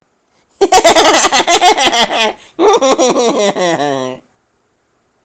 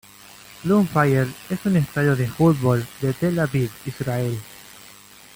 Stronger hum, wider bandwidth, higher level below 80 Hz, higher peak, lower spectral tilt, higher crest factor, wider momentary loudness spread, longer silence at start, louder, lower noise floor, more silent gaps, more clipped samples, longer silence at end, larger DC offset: neither; about the same, 17 kHz vs 17 kHz; first, -44 dBFS vs -52 dBFS; first, 0 dBFS vs -6 dBFS; second, -2 dB/octave vs -7 dB/octave; about the same, 12 dB vs 16 dB; second, 9 LU vs 18 LU; about the same, 0.6 s vs 0.5 s; first, -9 LUFS vs -21 LUFS; first, -59 dBFS vs -46 dBFS; neither; first, 0.2% vs under 0.1%; first, 1.05 s vs 0.55 s; neither